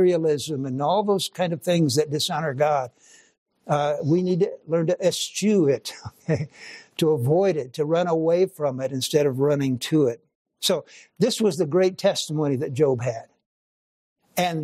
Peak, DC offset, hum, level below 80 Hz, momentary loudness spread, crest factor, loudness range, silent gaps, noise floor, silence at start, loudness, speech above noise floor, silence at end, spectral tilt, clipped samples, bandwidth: -6 dBFS; under 0.1%; none; -68 dBFS; 7 LU; 16 dB; 2 LU; 3.38-3.46 s, 10.35-10.45 s, 13.46-14.16 s; under -90 dBFS; 0 s; -23 LUFS; over 68 dB; 0 s; -5.5 dB/octave; under 0.1%; 15.5 kHz